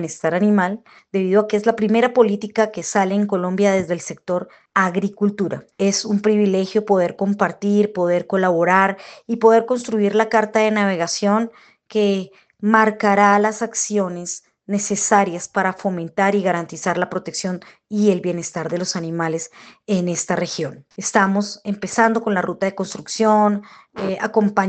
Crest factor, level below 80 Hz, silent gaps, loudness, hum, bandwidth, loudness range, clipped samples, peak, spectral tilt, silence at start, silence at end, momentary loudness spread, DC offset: 18 dB; -64 dBFS; none; -19 LUFS; none; 9 kHz; 4 LU; under 0.1%; 0 dBFS; -5 dB/octave; 0 s; 0 s; 11 LU; under 0.1%